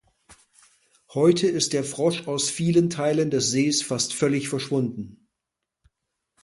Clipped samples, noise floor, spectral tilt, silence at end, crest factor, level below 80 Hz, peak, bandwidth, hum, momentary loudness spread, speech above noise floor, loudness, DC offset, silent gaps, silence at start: under 0.1%; -84 dBFS; -4.5 dB/octave; 1.3 s; 20 dB; -64 dBFS; -6 dBFS; 11.5 kHz; none; 6 LU; 61 dB; -23 LUFS; under 0.1%; none; 0.3 s